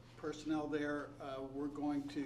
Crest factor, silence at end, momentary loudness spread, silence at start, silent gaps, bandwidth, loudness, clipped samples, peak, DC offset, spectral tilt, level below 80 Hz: 14 dB; 0 s; 7 LU; 0 s; none; 11 kHz; -42 LUFS; under 0.1%; -28 dBFS; under 0.1%; -6 dB/octave; -66 dBFS